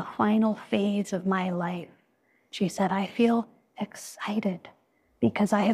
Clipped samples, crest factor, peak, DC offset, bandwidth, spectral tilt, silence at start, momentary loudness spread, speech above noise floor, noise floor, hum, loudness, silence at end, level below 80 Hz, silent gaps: under 0.1%; 18 dB; -10 dBFS; under 0.1%; 14 kHz; -6 dB/octave; 0 s; 14 LU; 42 dB; -68 dBFS; none; -28 LUFS; 0 s; -68 dBFS; none